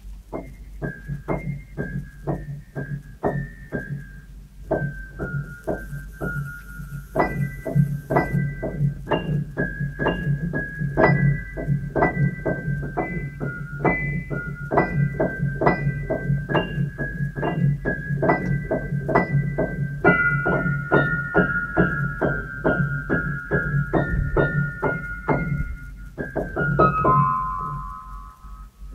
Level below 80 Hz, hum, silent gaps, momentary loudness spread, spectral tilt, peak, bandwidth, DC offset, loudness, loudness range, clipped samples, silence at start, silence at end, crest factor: -36 dBFS; none; none; 14 LU; -9 dB/octave; 0 dBFS; 12.5 kHz; under 0.1%; -24 LUFS; 9 LU; under 0.1%; 0 s; 0 s; 24 dB